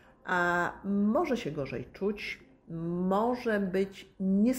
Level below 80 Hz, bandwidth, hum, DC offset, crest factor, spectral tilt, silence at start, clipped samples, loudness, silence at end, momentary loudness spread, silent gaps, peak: -60 dBFS; 13.5 kHz; none; under 0.1%; 14 dB; -7 dB/octave; 0.25 s; under 0.1%; -31 LUFS; 0 s; 10 LU; none; -16 dBFS